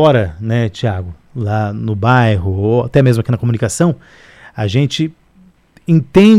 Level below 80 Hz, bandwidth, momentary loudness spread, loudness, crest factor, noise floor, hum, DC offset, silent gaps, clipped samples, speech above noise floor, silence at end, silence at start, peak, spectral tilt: -40 dBFS; 12.5 kHz; 11 LU; -15 LUFS; 12 dB; -48 dBFS; none; under 0.1%; none; under 0.1%; 35 dB; 0 s; 0 s; 0 dBFS; -7 dB/octave